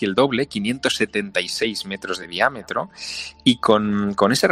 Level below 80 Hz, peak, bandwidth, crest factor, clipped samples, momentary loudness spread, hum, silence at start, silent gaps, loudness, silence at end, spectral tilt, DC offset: -56 dBFS; -2 dBFS; 16 kHz; 18 dB; under 0.1%; 10 LU; none; 0 s; none; -21 LUFS; 0 s; -4 dB/octave; under 0.1%